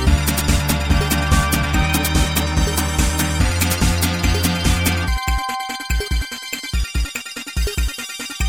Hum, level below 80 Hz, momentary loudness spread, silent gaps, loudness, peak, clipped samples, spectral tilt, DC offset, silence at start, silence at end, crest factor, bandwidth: none; -22 dBFS; 8 LU; none; -19 LUFS; -2 dBFS; under 0.1%; -4 dB/octave; under 0.1%; 0 s; 0 s; 16 dB; 18 kHz